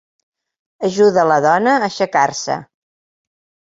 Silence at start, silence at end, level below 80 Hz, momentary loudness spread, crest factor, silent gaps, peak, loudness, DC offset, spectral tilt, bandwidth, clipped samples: 0.8 s; 1.15 s; -64 dBFS; 10 LU; 16 dB; none; -2 dBFS; -15 LUFS; under 0.1%; -4.5 dB/octave; 7.8 kHz; under 0.1%